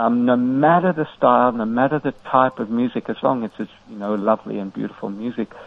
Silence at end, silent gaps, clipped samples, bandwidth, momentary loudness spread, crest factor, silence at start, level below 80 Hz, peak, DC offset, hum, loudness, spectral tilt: 0 s; none; under 0.1%; 5 kHz; 13 LU; 18 dB; 0 s; -60 dBFS; 0 dBFS; under 0.1%; none; -20 LUFS; -9 dB/octave